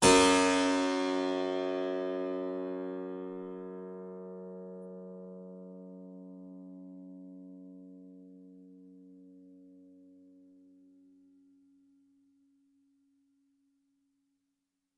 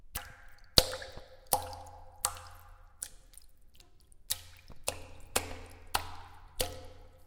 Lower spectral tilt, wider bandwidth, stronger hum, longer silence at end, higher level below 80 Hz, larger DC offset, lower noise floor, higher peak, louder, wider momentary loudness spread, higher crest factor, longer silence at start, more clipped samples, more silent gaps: first, -3 dB/octave vs -1.5 dB/octave; second, 11.5 kHz vs 18 kHz; neither; first, 5.3 s vs 0 s; second, -66 dBFS vs -50 dBFS; neither; first, -84 dBFS vs -56 dBFS; second, -10 dBFS vs -2 dBFS; first, -31 LUFS vs -34 LUFS; about the same, 26 LU vs 25 LU; second, 26 dB vs 36 dB; about the same, 0 s vs 0 s; neither; neither